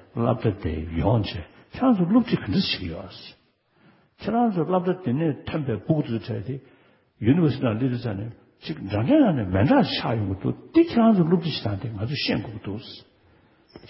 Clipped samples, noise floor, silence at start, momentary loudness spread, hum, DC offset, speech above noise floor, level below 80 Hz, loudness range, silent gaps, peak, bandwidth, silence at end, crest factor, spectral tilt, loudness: under 0.1%; -60 dBFS; 0.15 s; 16 LU; none; under 0.1%; 37 dB; -44 dBFS; 5 LU; none; -6 dBFS; 5.8 kHz; 0.05 s; 18 dB; -11 dB/octave; -23 LUFS